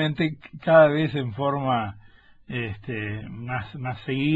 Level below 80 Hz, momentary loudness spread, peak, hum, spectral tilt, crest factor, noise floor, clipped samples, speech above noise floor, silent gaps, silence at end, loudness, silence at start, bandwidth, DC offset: -54 dBFS; 16 LU; -4 dBFS; none; -9 dB/octave; 20 dB; -52 dBFS; under 0.1%; 29 dB; none; 0 s; -24 LUFS; 0 s; 7.6 kHz; under 0.1%